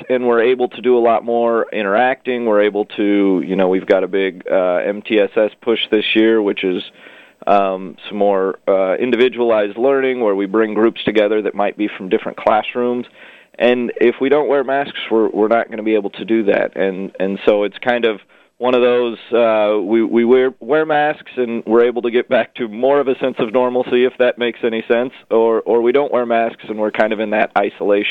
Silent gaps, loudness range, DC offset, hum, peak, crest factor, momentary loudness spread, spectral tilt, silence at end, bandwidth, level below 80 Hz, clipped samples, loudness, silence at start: none; 2 LU; under 0.1%; none; 0 dBFS; 16 dB; 6 LU; -7.5 dB/octave; 0 s; 4.9 kHz; -62 dBFS; under 0.1%; -16 LUFS; 0 s